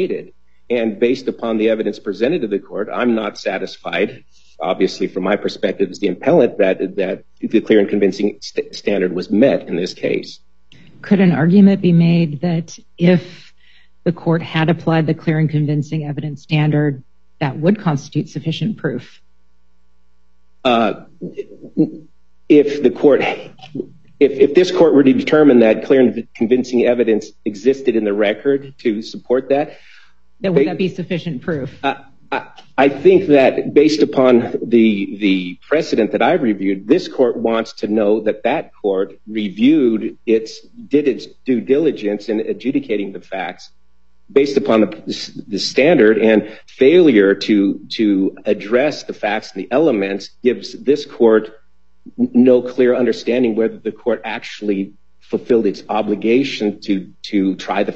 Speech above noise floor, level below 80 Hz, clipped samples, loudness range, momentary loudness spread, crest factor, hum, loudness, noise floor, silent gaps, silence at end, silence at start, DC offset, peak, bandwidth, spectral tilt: 46 dB; -58 dBFS; under 0.1%; 7 LU; 12 LU; 16 dB; none; -16 LUFS; -62 dBFS; none; 0 s; 0 s; 0.7%; 0 dBFS; 7.8 kHz; -7 dB/octave